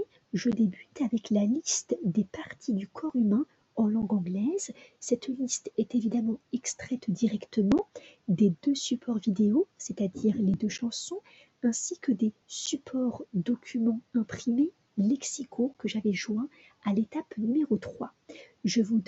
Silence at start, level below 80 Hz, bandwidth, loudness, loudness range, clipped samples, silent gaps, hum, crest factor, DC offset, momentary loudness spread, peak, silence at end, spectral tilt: 0 s; -64 dBFS; 8.2 kHz; -30 LUFS; 3 LU; under 0.1%; none; none; 16 dB; under 0.1%; 8 LU; -14 dBFS; 0.05 s; -5 dB/octave